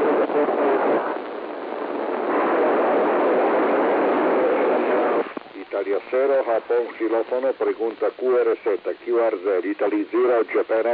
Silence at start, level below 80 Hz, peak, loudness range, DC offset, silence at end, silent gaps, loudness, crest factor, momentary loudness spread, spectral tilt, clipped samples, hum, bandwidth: 0 s; -76 dBFS; -10 dBFS; 3 LU; under 0.1%; 0 s; none; -22 LUFS; 12 dB; 8 LU; -8.5 dB/octave; under 0.1%; none; 5 kHz